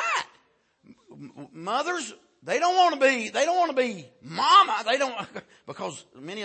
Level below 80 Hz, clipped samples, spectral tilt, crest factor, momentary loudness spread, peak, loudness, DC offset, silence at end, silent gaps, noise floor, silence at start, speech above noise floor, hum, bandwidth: -80 dBFS; under 0.1%; -2.5 dB/octave; 20 dB; 23 LU; -6 dBFS; -23 LUFS; under 0.1%; 0 s; none; -65 dBFS; 0 s; 40 dB; none; 8.8 kHz